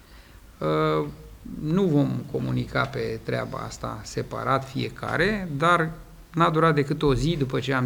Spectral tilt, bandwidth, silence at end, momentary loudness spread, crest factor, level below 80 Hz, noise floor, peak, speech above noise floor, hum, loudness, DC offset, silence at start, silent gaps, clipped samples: -6.5 dB/octave; over 20 kHz; 0 s; 12 LU; 18 dB; -44 dBFS; -48 dBFS; -6 dBFS; 24 dB; none; -25 LUFS; under 0.1%; 0.1 s; none; under 0.1%